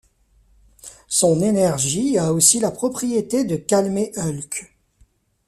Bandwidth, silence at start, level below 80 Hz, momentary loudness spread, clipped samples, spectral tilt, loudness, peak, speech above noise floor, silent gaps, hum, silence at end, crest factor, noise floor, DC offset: 15 kHz; 0.85 s; -54 dBFS; 11 LU; under 0.1%; -4 dB/octave; -19 LUFS; -2 dBFS; 39 dB; none; none; 0.85 s; 20 dB; -58 dBFS; under 0.1%